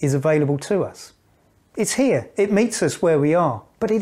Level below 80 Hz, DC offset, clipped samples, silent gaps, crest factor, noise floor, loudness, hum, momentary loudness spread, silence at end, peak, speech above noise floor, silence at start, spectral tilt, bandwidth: -58 dBFS; under 0.1%; under 0.1%; none; 14 dB; -59 dBFS; -20 LUFS; none; 7 LU; 0 s; -6 dBFS; 39 dB; 0 s; -5.5 dB/octave; 15.5 kHz